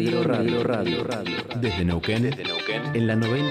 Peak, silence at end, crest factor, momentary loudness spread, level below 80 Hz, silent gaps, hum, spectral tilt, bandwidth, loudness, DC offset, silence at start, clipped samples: -10 dBFS; 0 s; 14 dB; 4 LU; -48 dBFS; none; none; -6.5 dB/octave; 13.5 kHz; -24 LUFS; under 0.1%; 0 s; under 0.1%